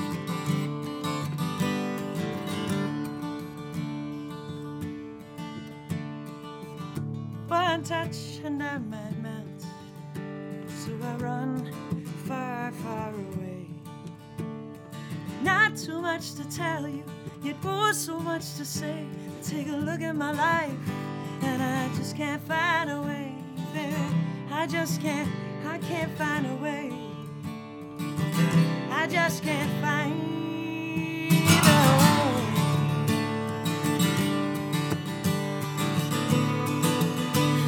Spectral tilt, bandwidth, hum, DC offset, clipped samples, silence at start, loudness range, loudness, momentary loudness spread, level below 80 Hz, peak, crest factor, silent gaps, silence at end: -5 dB/octave; over 20 kHz; none; under 0.1%; under 0.1%; 0 s; 12 LU; -28 LUFS; 14 LU; -62 dBFS; -4 dBFS; 24 dB; none; 0 s